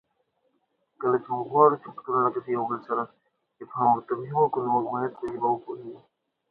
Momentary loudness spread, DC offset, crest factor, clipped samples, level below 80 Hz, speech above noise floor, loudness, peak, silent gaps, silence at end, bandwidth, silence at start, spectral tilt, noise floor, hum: 14 LU; under 0.1%; 22 dB; under 0.1%; -72 dBFS; 48 dB; -26 LUFS; -4 dBFS; none; 0.5 s; 4.4 kHz; 1 s; -10.5 dB/octave; -73 dBFS; none